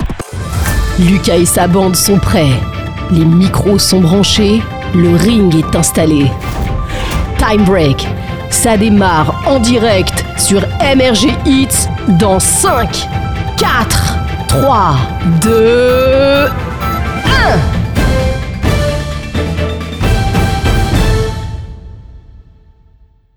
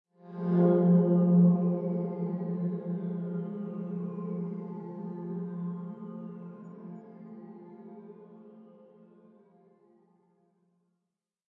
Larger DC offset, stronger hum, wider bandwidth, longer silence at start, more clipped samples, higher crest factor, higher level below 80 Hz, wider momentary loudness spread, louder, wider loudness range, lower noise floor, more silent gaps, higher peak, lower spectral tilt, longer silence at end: neither; neither; first, over 20 kHz vs 2.2 kHz; second, 0 s vs 0.25 s; neither; second, 10 dB vs 18 dB; first, -20 dBFS vs -82 dBFS; second, 9 LU vs 25 LU; first, -11 LUFS vs -29 LUFS; second, 4 LU vs 24 LU; second, -46 dBFS vs -86 dBFS; neither; first, 0 dBFS vs -14 dBFS; second, -5 dB/octave vs -13.5 dB/octave; second, 1 s vs 2.9 s